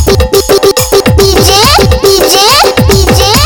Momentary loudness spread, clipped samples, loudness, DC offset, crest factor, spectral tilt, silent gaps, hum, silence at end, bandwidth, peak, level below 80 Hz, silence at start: 3 LU; 1%; -5 LUFS; under 0.1%; 6 dB; -3.5 dB/octave; none; none; 0 s; 18.5 kHz; 0 dBFS; -16 dBFS; 0 s